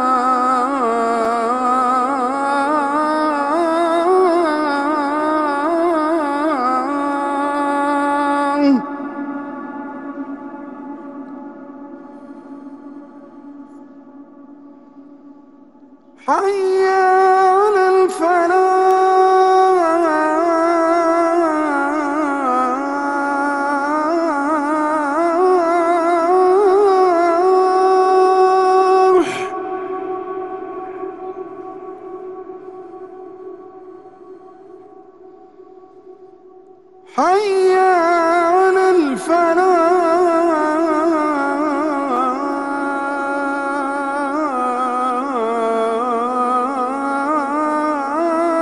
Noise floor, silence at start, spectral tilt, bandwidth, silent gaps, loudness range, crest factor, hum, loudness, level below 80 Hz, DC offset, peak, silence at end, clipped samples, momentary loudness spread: -45 dBFS; 0 s; -4.5 dB/octave; 11.5 kHz; none; 18 LU; 14 dB; none; -16 LUFS; -62 dBFS; 0.2%; -4 dBFS; 0 s; under 0.1%; 19 LU